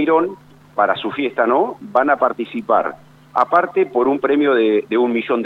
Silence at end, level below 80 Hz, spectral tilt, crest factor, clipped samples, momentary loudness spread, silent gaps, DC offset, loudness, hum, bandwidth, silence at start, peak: 0 s; -62 dBFS; -7 dB/octave; 16 dB; under 0.1%; 7 LU; none; under 0.1%; -17 LUFS; none; 5.8 kHz; 0 s; -2 dBFS